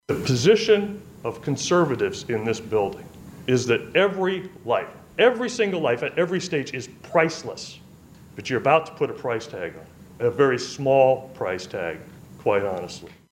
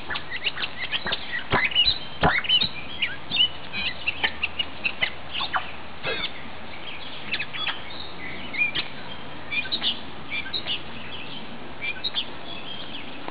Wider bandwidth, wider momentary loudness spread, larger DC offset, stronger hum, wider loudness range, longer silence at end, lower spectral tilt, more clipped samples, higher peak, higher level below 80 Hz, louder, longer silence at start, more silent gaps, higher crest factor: first, 16 kHz vs 4 kHz; about the same, 15 LU vs 16 LU; second, under 0.1% vs 2%; neither; second, 3 LU vs 8 LU; first, 0.2 s vs 0 s; first, -5 dB/octave vs 0 dB/octave; neither; first, -4 dBFS vs -8 dBFS; second, -58 dBFS vs -50 dBFS; about the same, -23 LUFS vs -25 LUFS; about the same, 0.1 s vs 0 s; neither; about the same, 20 dB vs 20 dB